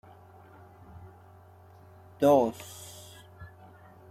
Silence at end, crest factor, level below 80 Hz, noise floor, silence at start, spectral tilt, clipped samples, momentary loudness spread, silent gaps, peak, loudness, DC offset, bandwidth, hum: 0.65 s; 22 dB; -68 dBFS; -54 dBFS; 2.2 s; -6 dB/octave; under 0.1%; 28 LU; none; -10 dBFS; -25 LUFS; under 0.1%; 15.5 kHz; none